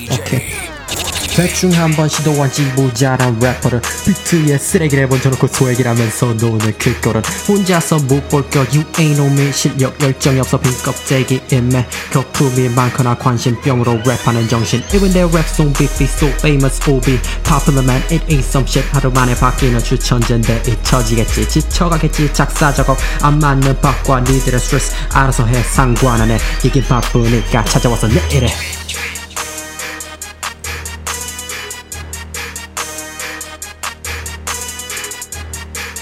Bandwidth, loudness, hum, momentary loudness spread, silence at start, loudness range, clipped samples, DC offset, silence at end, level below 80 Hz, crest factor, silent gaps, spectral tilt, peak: 16.5 kHz; -14 LUFS; none; 11 LU; 0 s; 10 LU; under 0.1%; under 0.1%; 0 s; -22 dBFS; 14 dB; none; -5 dB/octave; 0 dBFS